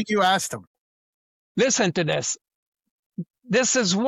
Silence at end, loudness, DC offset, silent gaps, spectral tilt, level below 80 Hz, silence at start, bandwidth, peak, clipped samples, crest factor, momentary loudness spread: 0 s; -22 LUFS; under 0.1%; 0.67-1.55 s, 2.55-2.72 s, 2.90-3.10 s, 3.30-3.34 s; -3 dB/octave; -68 dBFS; 0 s; 14 kHz; -8 dBFS; under 0.1%; 16 dB; 18 LU